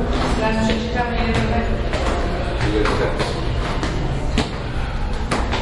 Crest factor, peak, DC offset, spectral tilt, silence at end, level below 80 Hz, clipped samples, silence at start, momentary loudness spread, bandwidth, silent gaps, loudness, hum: 16 dB; -2 dBFS; under 0.1%; -6 dB/octave; 0 s; -24 dBFS; under 0.1%; 0 s; 6 LU; 11.5 kHz; none; -21 LUFS; none